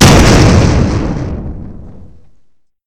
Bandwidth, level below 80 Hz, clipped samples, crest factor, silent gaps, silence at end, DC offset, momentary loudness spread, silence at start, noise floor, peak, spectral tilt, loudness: 17.5 kHz; -18 dBFS; 2%; 10 dB; none; 0.95 s; 2%; 21 LU; 0 s; -48 dBFS; 0 dBFS; -5 dB/octave; -9 LUFS